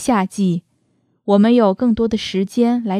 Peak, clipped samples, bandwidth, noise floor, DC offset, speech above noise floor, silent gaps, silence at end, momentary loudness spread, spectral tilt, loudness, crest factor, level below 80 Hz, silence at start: -2 dBFS; under 0.1%; 13 kHz; -63 dBFS; under 0.1%; 48 dB; none; 0 s; 7 LU; -6.5 dB/octave; -17 LUFS; 16 dB; -48 dBFS; 0 s